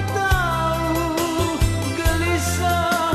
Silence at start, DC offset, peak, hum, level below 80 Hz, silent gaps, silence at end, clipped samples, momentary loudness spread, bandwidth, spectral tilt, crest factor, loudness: 0 s; under 0.1%; -6 dBFS; none; -28 dBFS; none; 0 s; under 0.1%; 2 LU; 15.5 kHz; -4.5 dB/octave; 14 dB; -21 LUFS